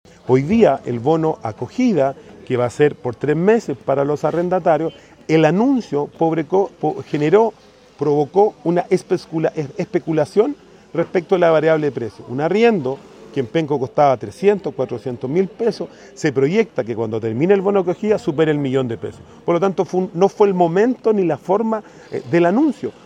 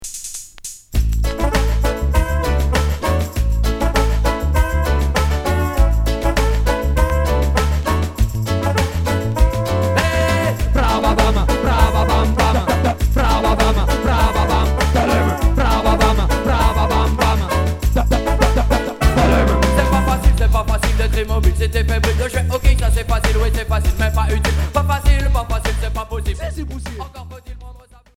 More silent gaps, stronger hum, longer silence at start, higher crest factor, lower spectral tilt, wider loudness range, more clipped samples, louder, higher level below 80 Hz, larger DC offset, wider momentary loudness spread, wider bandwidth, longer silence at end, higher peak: neither; neither; first, 0.25 s vs 0 s; about the same, 18 dB vs 16 dB; first, -7.5 dB/octave vs -5.5 dB/octave; about the same, 2 LU vs 3 LU; neither; about the same, -18 LUFS vs -17 LUFS; second, -56 dBFS vs -18 dBFS; neither; first, 10 LU vs 6 LU; second, 9.8 kHz vs 16.5 kHz; second, 0.15 s vs 0.4 s; about the same, 0 dBFS vs 0 dBFS